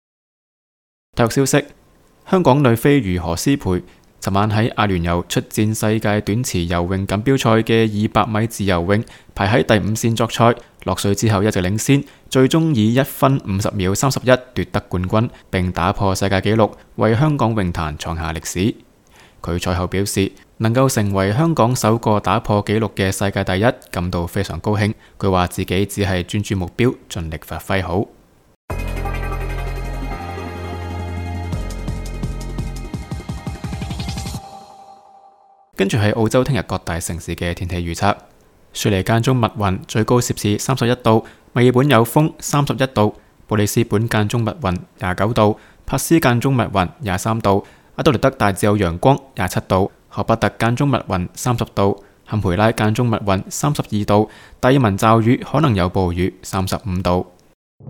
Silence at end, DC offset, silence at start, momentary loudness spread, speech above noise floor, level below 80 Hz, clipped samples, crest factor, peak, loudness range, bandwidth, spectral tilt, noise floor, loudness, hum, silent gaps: 0 s; under 0.1%; 1.15 s; 12 LU; 33 dB; -36 dBFS; under 0.1%; 18 dB; 0 dBFS; 9 LU; 18.5 kHz; -6 dB/octave; -50 dBFS; -18 LUFS; none; 28.56-28.68 s, 57.54-57.78 s